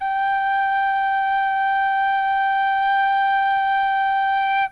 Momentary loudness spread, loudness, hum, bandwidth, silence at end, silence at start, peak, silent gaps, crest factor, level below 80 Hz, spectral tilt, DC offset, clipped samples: 2 LU; -19 LUFS; none; 5 kHz; 0 s; 0 s; -12 dBFS; none; 8 dB; -56 dBFS; -1.5 dB/octave; under 0.1%; under 0.1%